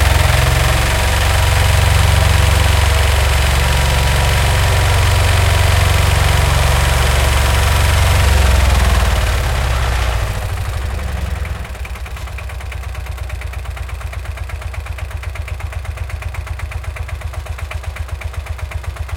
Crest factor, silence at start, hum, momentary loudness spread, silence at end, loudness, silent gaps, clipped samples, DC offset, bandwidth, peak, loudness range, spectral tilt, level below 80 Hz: 14 dB; 0 s; none; 13 LU; 0 s; -15 LUFS; none; under 0.1%; under 0.1%; 17 kHz; 0 dBFS; 12 LU; -4 dB/octave; -18 dBFS